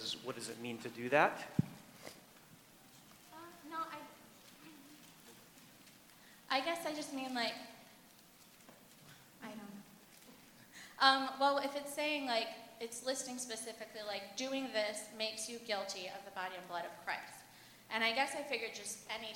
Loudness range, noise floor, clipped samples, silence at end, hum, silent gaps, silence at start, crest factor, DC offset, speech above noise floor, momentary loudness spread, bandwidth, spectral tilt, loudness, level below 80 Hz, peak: 15 LU; -62 dBFS; under 0.1%; 0 s; none; none; 0 s; 28 dB; under 0.1%; 24 dB; 25 LU; 19 kHz; -3 dB/octave; -38 LUFS; -82 dBFS; -12 dBFS